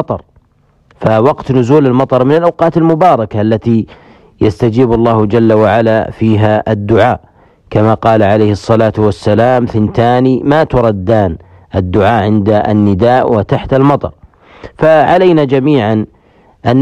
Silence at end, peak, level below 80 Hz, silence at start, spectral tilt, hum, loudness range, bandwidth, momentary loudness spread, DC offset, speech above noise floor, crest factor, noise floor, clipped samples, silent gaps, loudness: 0 s; 0 dBFS; -36 dBFS; 0 s; -8.5 dB/octave; none; 1 LU; 9 kHz; 7 LU; under 0.1%; 42 dB; 10 dB; -51 dBFS; under 0.1%; none; -10 LUFS